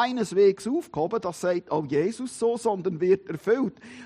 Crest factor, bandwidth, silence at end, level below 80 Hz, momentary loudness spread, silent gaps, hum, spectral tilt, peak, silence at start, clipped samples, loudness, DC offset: 14 dB; 13.5 kHz; 0 s; -66 dBFS; 7 LU; none; none; -6 dB/octave; -10 dBFS; 0 s; under 0.1%; -26 LUFS; under 0.1%